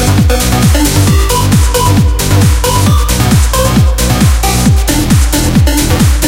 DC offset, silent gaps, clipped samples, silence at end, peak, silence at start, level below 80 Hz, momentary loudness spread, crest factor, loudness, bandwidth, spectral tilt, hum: under 0.1%; none; 0.2%; 0 s; 0 dBFS; 0 s; -12 dBFS; 1 LU; 8 dB; -9 LUFS; 17 kHz; -5 dB/octave; none